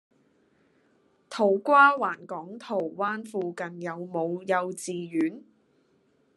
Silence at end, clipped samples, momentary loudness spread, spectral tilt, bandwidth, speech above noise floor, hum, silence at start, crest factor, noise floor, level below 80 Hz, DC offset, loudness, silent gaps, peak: 0.95 s; under 0.1%; 17 LU; -5 dB/octave; 12.5 kHz; 40 dB; none; 1.3 s; 20 dB; -67 dBFS; -84 dBFS; under 0.1%; -26 LUFS; none; -8 dBFS